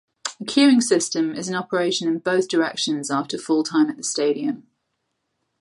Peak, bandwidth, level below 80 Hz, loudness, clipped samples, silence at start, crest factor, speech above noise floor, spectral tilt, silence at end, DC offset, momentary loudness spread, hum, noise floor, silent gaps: -4 dBFS; 11.5 kHz; -72 dBFS; -21 LUFS; under 0.1%; 0.25 s; 18 dB; 55 dB; -3.5 dB/octave; 1 s; under 0.1%; 10 LU; none; -75 dBFS; none